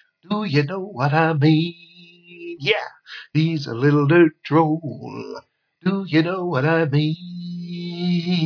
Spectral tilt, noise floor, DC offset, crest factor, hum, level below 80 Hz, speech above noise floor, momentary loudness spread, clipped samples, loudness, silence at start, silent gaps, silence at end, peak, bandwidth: -8 dB/octave; -46 dBFS; under 0.1%; 18 dB; none; -70 dBFS; 26 dB; 16 LU; under 0.1%; -20 LUFS; 0.3 s; none; 0 s; -2 dBFS; 5.4 kHz